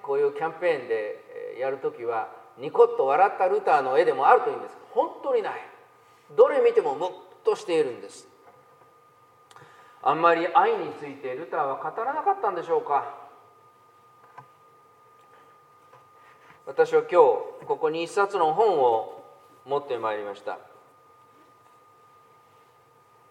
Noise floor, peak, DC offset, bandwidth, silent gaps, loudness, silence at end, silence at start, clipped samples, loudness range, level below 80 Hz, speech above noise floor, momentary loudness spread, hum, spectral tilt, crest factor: -58 dBFS; -2 dBFS; under 0.1%; 10 kHz; none; -24 LUFS; 2.7 s; 0.05 s; under 0.1%; 11 LU; -88 dBFS; 34 dB; 16 LU; none; -5 dB/octave; 24 dB